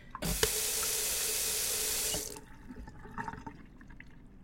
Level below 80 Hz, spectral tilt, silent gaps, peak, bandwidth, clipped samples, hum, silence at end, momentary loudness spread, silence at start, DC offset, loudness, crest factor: -50 dBFS; -1 dB/octave; none; -10 dBFS; 16.5 kHz; under 0.1%; none; 0 s; 20 LU; 0 s; under 0.1%; -31 LUFS; 26 dB